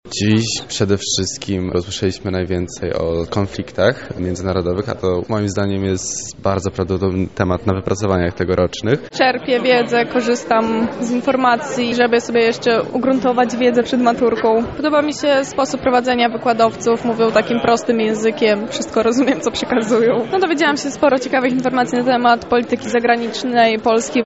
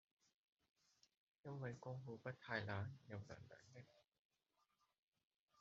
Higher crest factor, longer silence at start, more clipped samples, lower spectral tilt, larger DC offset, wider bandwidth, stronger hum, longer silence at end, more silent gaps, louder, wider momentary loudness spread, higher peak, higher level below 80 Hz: second, 14 dB vs 26 dB; second, 0.05 s vs 1.45 s; neither; about the same, -4 dB/octave vs -5 dB/octave; first, 0.2% vs under 0.1%; about the same, 8 kHz vs 7.6 kHz; neither; about the same, 0 s vs 0 s; second, none vs 4.19-4.29 s, 4.99-5.08 s, 5.36-5.48 s; first, -17 LUFS vs -52 LUFS; second, 6 LU vs 16 LU; first, -2 dBFS vs -30 dBFS; first, -44 dBFS vs -84 dBFS